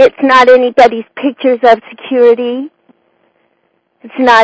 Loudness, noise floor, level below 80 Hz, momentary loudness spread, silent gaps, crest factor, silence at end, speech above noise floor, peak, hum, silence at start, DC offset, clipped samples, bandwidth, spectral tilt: -9 LUFS; -59 dBFS; -52 dBFS; 13 LU; none; 10 dB; 0 s; 51 dB; 0 dBFS; none; 0 s; under 0.1%; 4%; 8 kHz; -4 dB/octave